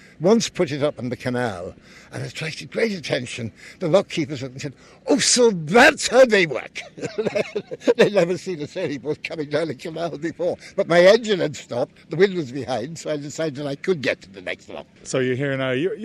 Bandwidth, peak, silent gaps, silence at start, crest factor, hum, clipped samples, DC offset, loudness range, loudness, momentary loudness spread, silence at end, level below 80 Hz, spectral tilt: 14.5 kHz; -4 dBFS; none; 0.2 s; 18 dB; none; under 0.1%; under 0.1%; 8 LU; -21 LUFS; 17 LU; 0 s; -58 dBFS; -4 dB/octave